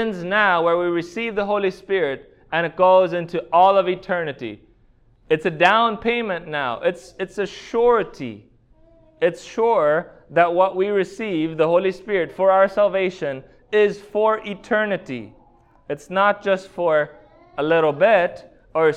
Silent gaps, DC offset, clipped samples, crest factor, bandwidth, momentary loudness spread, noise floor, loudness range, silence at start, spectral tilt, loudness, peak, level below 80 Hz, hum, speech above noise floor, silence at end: none; under 0.1%; under 0.1%; 18 dB; 9.6 kHz; 13 LU; -55 dBFS; 4 LU; 0 s; -6 dB/octave; -20 LUFS; -2 dBFS; -56 dBFS; none; 36 dB; 0 s